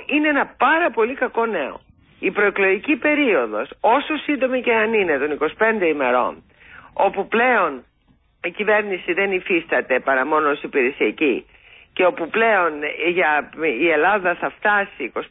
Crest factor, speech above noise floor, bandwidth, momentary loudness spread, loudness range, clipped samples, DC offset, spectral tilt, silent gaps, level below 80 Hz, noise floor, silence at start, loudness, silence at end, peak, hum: 14 dB; 40 dB; 4 kHz; 7 LU; 2 LU; under 0.1%; under 0.1%; -9.5 dB/octave; none; -58 dBFS; -59 dBFS; 0 s; -19 LUFS; 0.05 s; -6 dBFS; none